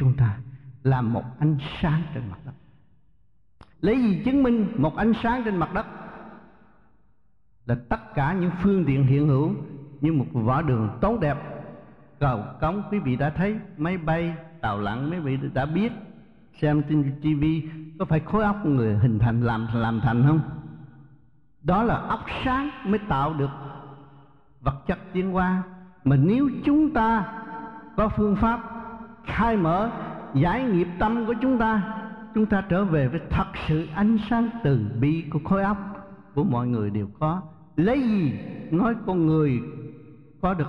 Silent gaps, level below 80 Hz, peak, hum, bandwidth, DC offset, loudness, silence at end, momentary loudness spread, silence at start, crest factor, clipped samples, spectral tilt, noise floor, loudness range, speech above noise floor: none; -42 dBFS; -8 dBFS; none; 5.4 kHz; under 0.1%; -24 LUFS; 0 s; 13 LU; 0 s; 16 dB; under 0.1%; -10 dB/octave; -67 dBFS; 4 LU; 44 dB